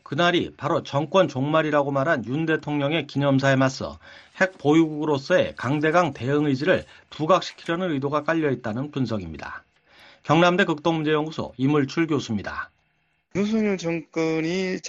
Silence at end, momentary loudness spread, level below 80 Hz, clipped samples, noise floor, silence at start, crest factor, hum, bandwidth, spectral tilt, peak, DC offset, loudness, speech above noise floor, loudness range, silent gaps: 0 s; 11 LU; -58 dBFS; under 0.1%; -69 dBFS; 0.1 s; 20 dB; none; 8 kHz; -6 dB/octave; -4 dBFS; under 0.1%; -23 LUFS; 46 dB; 3 LU; none